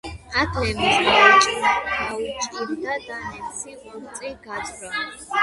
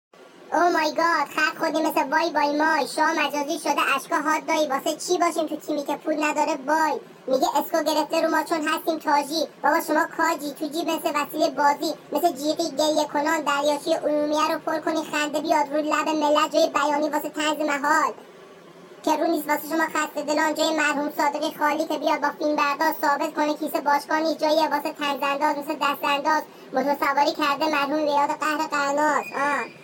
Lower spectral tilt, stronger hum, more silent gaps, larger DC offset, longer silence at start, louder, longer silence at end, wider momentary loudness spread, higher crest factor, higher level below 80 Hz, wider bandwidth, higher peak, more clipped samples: about the same, -2.5 dB/octave vs -2.5 dB/octave; neither; neither; neither; second, 0.05 s vs 0.2 s; first, -19 LUFS vs -23 LUFS; about the same, 0 s vs 0 s; first, 20 LU vs 5 LU; about the same, 20 dB vs 16 dB; first, -44 dBFS vs -72 dBFS; second, 11.5 kHz vs 17 kHz; first, -2 dBFS vs -8 dBFS; neither